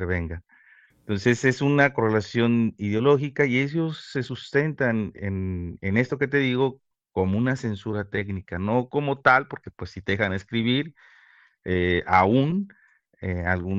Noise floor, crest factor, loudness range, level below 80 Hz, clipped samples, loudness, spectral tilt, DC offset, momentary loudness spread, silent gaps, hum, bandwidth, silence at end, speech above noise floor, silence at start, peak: -57 dBFS; 20 dB; 3 LU; -50 dBFS; under 0.1%; -24 LUFS; -7 dB/octave; under 0.1%; 12 LU; none; none; 8 kHz; 0 s; 33 dB; 0 s; -4 dBFS